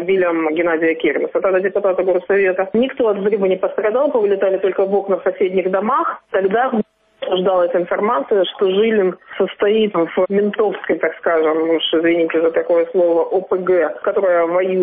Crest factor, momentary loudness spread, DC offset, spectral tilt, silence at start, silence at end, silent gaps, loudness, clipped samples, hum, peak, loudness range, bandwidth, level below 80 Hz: 10 dB; 3 LU; under 0.1%; -3.5 dB/octave; 0 s; 0 s; none; -17 LUFS; under 0.1%; none; -6 dBFS; 2 LU; 3.8 kHz; -60 dBFS